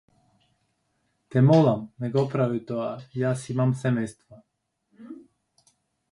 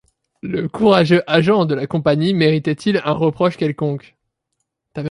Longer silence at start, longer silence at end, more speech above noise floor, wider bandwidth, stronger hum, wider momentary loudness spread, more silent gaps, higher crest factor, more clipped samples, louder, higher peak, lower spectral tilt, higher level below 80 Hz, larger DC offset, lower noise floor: first, 1.3 s vs 0.45 s; first, 0.9 s vs 0 s; second, 49 dB vs 59 dB; about the same, 11.5 kHz vs 11 kHz; neither; first, 22 LU vs 12 LU; neither; about the same, 20 dB vs 16 dB; neither; second, -24 LUFS vs -17 LUFS; second, -6 dBFS vs -2 dBFS; about the same, -8 dB/octave vs -7.5 dB/octave; second, -66 dBFS vs -52 dBFS; neither; about the same, -73 dBFS vs -75 dBFS